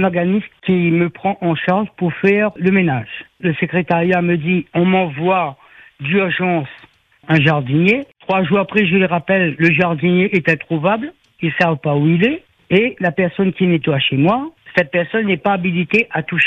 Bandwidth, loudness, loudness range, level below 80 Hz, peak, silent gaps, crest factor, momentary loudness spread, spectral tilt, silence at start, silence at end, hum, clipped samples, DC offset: 5.8 kHz; -16 LUFS; 2 LU; -54 dBFS; 0 dBFS; none; 16 dB; 6 LU; -8.5 dB/octave; 0 s; 0 s; none; under 0.1%; under 0.1%